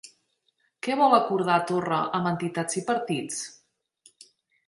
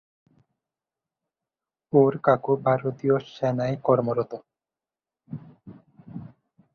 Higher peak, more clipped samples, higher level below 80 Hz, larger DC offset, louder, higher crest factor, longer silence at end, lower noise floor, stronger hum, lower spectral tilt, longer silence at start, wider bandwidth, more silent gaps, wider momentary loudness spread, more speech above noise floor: about the same, -6 dBFS vs -6 dBFS; neither; second, -72 dBFS vs -66 dBFS; neither; about the same, -25 LUFS vs -24 LUFS; about the same, 22 dB vs 22 dB; first, 1.15 s vs 0.45 s; second, -72 dBFS vs under -90 dBFS; neither; second, -4.5 dB/octave vs -9 dB/octave; second, 0.05 s vs 1.95 s; first, 11.5 kHz vs 6.6 kHz; neither; second, 13 LU vs 21 LU; second, 47 dB vs over 67 dB